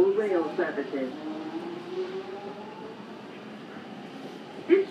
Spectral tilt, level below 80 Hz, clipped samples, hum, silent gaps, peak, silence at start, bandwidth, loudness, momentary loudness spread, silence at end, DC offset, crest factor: -6.5 dB/octave; -80 dBFS; under 0.1%; none; none; -8 dBFS; 0 s; 9 kHz; -32 LUFS; 17 LU; 0 s; under 0.1%; 22 dB